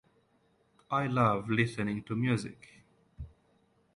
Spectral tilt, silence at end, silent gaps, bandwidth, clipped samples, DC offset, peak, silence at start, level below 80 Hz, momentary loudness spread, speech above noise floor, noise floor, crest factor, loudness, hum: -7 dB/octave; 0.65 s; none; 11 kHz; under 0.1%; under 0.1%; -12 dBFS; 0.9 s; -58 dBFS; 22 LU; 40 dB; -70 dBFS; 22 dB; -31 LUFS; none